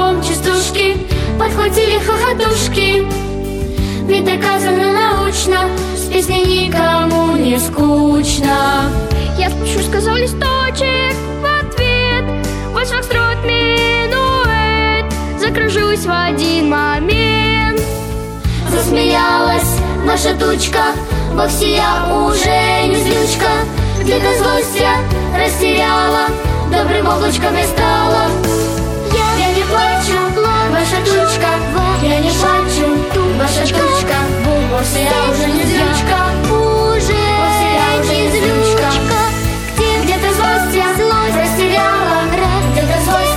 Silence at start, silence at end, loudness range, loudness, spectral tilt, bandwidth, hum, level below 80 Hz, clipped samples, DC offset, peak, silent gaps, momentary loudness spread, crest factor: 0 s; 0 s; 2 LU; -13 LUFS; -4.5 dB/octave; 17 kHz; none; -24 dBFS; under 0.1%; under 0.1%; 0 dBFS; none; 4 LU; 12 dB